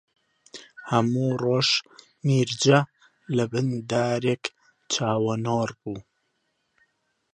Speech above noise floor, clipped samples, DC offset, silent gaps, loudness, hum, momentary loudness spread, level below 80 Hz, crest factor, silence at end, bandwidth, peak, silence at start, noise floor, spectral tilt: 50 dB; under 0.1%; under 0.1%; none; -24 LUFS; none; 16 LU; -64 dBFS; 22 dB; 1.35 s; 10.5 kHz; -4 dBFS; 0.55 s; -74 dBFS; -5 dB/octave